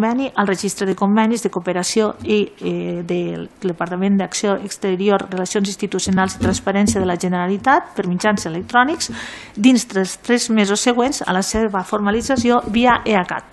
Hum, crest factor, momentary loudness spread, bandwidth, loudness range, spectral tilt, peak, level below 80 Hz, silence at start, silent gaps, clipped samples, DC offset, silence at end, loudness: none; 18 dB; 7 LU; 12.5 kHz; 3 LU; -4.5 dB/octave; 0 dBFS; -42 dBFS; 0 s; none; under 0.1%; under 0.1%; 0.1 s; -18 LUFS